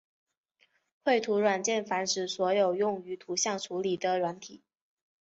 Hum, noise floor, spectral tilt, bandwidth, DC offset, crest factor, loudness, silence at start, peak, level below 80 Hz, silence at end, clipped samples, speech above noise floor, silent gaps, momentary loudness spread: none; -71 dBFS; -3 dB/octave; 8 kHz; under 0.1%; 18 dB; -29 LUFS; 1.05 s; -14 dBFS; -78 dBFS; 0.65 s; under 0.1%; 42 dB; none; 8 LU